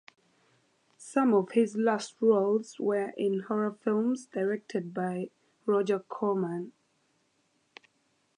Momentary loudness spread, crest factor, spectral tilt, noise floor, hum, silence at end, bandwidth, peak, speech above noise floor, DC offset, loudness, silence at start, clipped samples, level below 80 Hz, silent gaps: 10 LU; 18 dB; -6.5 dB/octave; -73 dBFS; none; 1.7 s; 11 kHz; -12 dBFS; 44 dB; under 0.1%; -29 LUFS; 1 s; under 0.1%; -84 dBFS; none